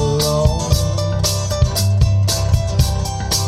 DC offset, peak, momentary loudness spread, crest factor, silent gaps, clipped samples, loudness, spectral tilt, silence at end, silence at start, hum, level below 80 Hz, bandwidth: under 0.1%; -2 dBFS; 3 LU; 14 dB; none; under 0.1%; -17 LUFS; -4.5 dB/octave; 0 s; 0 s; none; -22 dBFS; 15.5 kHz